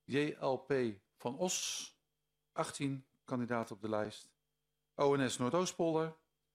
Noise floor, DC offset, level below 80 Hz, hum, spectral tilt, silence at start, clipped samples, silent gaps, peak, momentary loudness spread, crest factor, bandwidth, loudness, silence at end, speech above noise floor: -87 dBFS; under 0.1%; -76 dBFS; none; -4.5 dB/octave; 0.1 s; under 0.1%; none; -18 dBFS; 11 LU; 20 dB; 15.5 kHz; -37 LUFS; 0.4 s; 51 dB